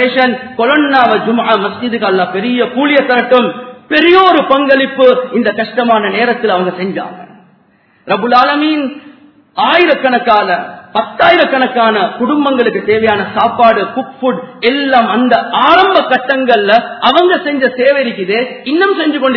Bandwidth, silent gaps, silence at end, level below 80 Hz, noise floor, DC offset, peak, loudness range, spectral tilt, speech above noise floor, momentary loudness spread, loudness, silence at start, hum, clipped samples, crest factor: 5.4 kHz; none; 0 s; -54 dBFS; -50 dBFS; under 0.1%; 0 dBFS; 4 LU; -6.5 dB/octave; 40 dB; 8 LU; -10 LUFS; 0 s; none; 0.5%; 10 dB